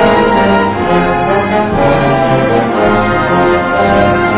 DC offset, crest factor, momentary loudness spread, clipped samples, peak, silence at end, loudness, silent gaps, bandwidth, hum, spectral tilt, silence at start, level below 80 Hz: under 0.1%; 10 dB; 2 LU; under 0.1%; 0 dBFS; 0 s; -10 LUFS; none; 5 kHz; none; -10 dB/octave; 0 s; -28 dBFS